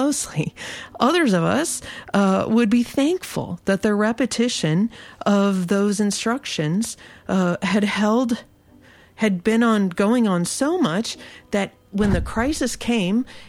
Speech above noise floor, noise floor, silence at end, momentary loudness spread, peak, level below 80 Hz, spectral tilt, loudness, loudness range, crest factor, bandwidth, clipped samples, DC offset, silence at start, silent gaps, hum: 30 dB; -50 dBFS; 0 s; 9 LU; -4 dBFS; -44 dBFS; -5 dB/octave; -21 LUFS; 2 LU; 18 dB; 15.5 kHz; under 0.1%; under 0.1%; 0 s; none; none